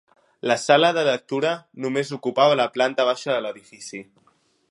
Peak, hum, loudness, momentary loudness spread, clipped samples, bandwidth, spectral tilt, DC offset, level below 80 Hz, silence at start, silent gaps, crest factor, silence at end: -2 dBFS; none; -21 LUFS; 19 LU; under 0.1%; 11.5 kHz; -4 dB/octave; under 0.1%; -76 dBFS; 0.45 s; none; 22 dB; 0.7 s